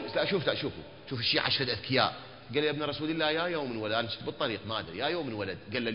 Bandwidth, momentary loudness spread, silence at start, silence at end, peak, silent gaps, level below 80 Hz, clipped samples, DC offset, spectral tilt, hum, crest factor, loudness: 5.6 kHz; 8 LU; 0 s; 0 s; -10 dBFS; none; -62 dBFS; under 0.1%; 0.1%; -8.5 dB/octave; none; 22 dB; -31 LUFS